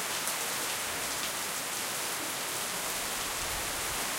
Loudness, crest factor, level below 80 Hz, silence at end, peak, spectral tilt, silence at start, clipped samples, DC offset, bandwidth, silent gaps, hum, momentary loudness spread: -32 LUFS; 20 dB; -56 dBFS; 0 s; -14 dBFS; -0.5 dB/octave; 0 s; under 0.1%; under 0.1%; 17 kHz; none; none; 1 LU